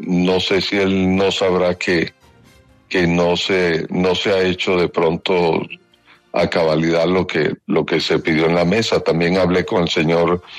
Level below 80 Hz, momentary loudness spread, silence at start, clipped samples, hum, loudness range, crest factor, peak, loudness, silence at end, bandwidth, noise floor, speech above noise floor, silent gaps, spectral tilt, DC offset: -48 dBFS; 4 LU; 0 s; under 0.1%; none; 2 LU; 12 dB; -4 dBFS; -17 LUFS; 0 s; 10.5 kHz; -52 dBFS; 35 dB; none; -5.5 dB/octave; under 0.1%